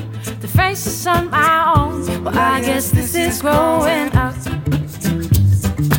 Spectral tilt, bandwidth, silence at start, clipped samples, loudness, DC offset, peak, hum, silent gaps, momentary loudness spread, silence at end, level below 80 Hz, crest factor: -5.5 dB/octave; 17 kHz; 0 s; under 0.1%; -16 LUFS; under 0.1%; 0 dBFS; none; none; 7 LU; 0 s; -30 dBFS; 16 dB